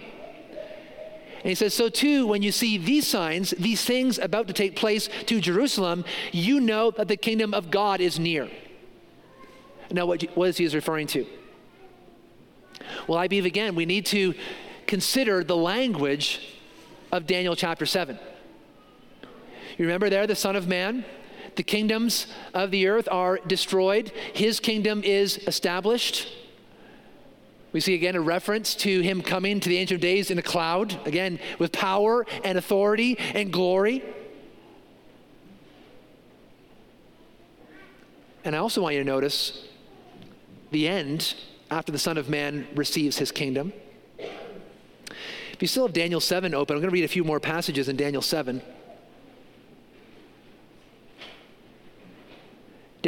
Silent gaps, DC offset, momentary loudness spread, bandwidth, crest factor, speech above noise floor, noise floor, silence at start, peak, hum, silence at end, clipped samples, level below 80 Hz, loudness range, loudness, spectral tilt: none; under 0.1%; 16 LU; 17 kHz; 20 dB; 29 dB; -54 dBFS; 0 s; -8 dBFS; none; 0 s; under 0.1%; -64 dBFS; 6 LU; -25 LUFS; -4 dB/octave